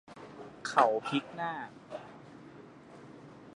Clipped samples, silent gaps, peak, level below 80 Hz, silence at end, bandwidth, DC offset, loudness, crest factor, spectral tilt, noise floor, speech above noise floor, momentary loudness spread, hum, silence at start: under 0.1%; none; -10 dBFS; -76 dBFS; 0.05 s; 11 kHz; under 0.1%; -32 LUFS; 26 dB; -4.5 dB/octave; -52 dBFS; 21 dB; 25 LU; none; 0.1 s